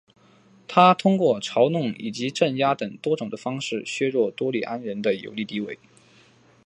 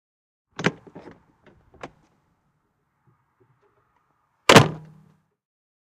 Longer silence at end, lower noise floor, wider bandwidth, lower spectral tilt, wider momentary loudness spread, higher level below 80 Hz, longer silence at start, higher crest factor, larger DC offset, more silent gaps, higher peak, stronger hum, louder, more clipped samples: second, 0.9 s vs 1.05 s; second, -56 dBFS vs -72 dBFS; second, 10.5 kHz vs 14.5 kHz; first, -5.5 dB/octave vs -4 dB/octave; second, 13 LU vs 30 LU; second, -72 dBFS vs -56 dBFS; about the same, 0.7 s vs 0.6 s; about the same, 22 dB vs 26 dB; neither; neither; about the same, -2 dBFS vs 0 dBFS; neither; second, -23 LUFS vs -18 LUFS; neither